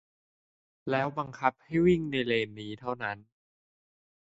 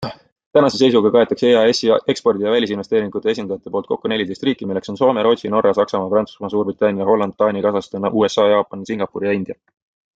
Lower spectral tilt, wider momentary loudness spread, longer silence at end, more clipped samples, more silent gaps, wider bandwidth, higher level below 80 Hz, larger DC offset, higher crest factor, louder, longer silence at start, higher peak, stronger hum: first, -7 dB/octave vs -5.5 dB/octave; about the same, 12 LU vs 10 LU; first, 1.1 s vs 0.65 s; neither; second, none vs 0.32-0.36 s, 0.46-0.51 s; about the same, 8 kHz vs 8 kHz; about the same, -60 dBFS vs -60 dBFS; neither; first, 24 dB vs 16 dB; second, -30 LUFS vs -17 LUFS; first, 0.85 s vs 0 s; second, -8 dBFS vs -2 dBFS; neither